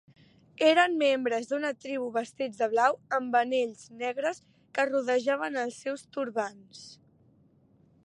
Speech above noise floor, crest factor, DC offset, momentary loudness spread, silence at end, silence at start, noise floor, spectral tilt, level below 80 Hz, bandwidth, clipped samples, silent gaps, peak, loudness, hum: 34 dB; 20 dB; under 0.1%; 12 LU; 1.1 s; 0.6 s; -63 dBFS; -3 dB/octave; -78 dBFS; 11.5 kHz; under 0.1%; none; -10 dBFS; -29 LUFS; none